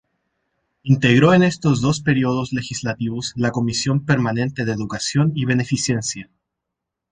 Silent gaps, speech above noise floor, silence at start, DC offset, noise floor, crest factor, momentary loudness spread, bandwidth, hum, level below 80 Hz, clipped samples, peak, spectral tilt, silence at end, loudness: none; 63 dB; 0.85 s; under 0.1%; -82 dBFS; 18 dB; 11 LU; 9.8 kHz; none; -50 dBFS; under 0.1%; -2 dBFS; -5.5 dB/octave; 0.9 s; -19 LUFS